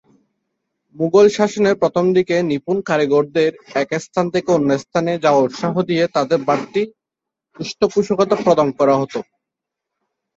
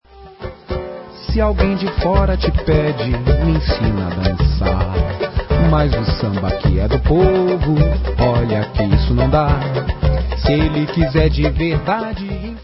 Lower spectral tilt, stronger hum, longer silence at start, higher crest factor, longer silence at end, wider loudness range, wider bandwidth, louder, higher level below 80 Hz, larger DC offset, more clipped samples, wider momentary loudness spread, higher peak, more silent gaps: second, -6 dB/octave vs -11.5 dB/octave; neither; first, 0.95 s vs 0.15 s; about the same, 16 dB vs 14 dB; first, 1.15 s vs 0 s; about the same, 3 LU vs 2 LU; first, 7.8 kHz vs 5.8 kHz; about the same, -17 LUFS vs -17 LUFS; second, -60 dBFS vs -20 dBFS; neither; neither; about the same, 8 LU vs 8 LU; about the same, -2 dBFS vs 0 dBFS; neither